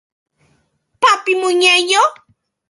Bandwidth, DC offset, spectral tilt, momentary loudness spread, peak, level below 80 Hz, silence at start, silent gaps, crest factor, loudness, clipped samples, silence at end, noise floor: 11.5 kHz; under 0.1%; 0 dB/octave; 5 LU; 0 dBFS; -70 dBFS; 1 s; none; 16 dB; -13 LUFS; under 0.1%; 0.55 s; -63 dBFS